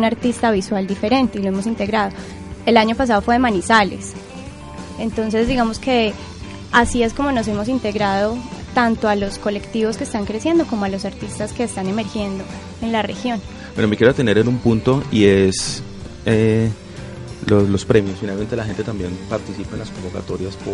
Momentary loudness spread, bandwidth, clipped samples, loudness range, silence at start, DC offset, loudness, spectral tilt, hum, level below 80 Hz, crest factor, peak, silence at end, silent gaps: 14 LU; 11.5 kHz; under 0.1%; 5 LU; 0 s; under 0.1%; -19 LUFS; -5.5 dB/octave; none; -38 dBFS; 18 dB; 0 dBFS; 0 s; none